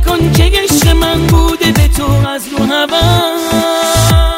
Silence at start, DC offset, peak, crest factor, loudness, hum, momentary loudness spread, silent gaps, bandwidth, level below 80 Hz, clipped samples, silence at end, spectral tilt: 0 s; under 0.1%; 0 dBFS; 10 dB; -10 LUFS; none; 4 LU; none; 16.5 kHz; -16 dBFS; under 0.1%; 0 s; -4.5 dB/octave